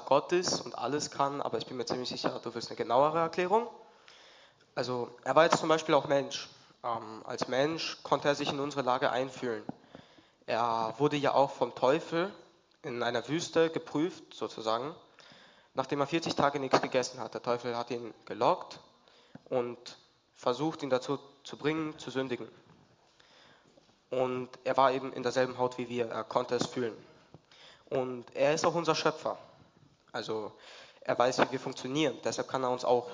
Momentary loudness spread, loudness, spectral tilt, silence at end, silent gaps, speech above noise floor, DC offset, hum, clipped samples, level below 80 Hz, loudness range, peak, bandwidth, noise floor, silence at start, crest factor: 13 LU; -32 LUFS; -4.5 dB/octave; 0 s; none; 33 dB; under 0.1%; none; under 0.1%; -74 dBFS; 5 LU; -10 dBFS; 7.6 kHz; -64 dBFS; 0 s; 24 dB